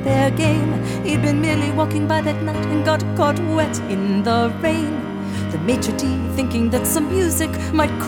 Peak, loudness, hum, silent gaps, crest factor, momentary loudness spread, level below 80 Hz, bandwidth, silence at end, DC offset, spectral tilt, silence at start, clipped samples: -4 dBFS; -19 LUFS; none; none; 16 dB; 4 LU; -40 dBFS; 18.5 kHz; 0 s; under 0.1%; -5.5 dB/octave; 0 s; under 0.1%